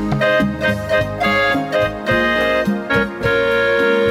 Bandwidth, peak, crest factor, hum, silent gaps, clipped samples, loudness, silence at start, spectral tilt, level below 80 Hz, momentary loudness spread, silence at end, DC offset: 16.5 kHz; -4 dBFS; 12 dB; none; none; under 0.1%; -16 LUFS; 0 s; -6 dB/octave; -38 dBFS; 4 LU; 0 s; under 0.1%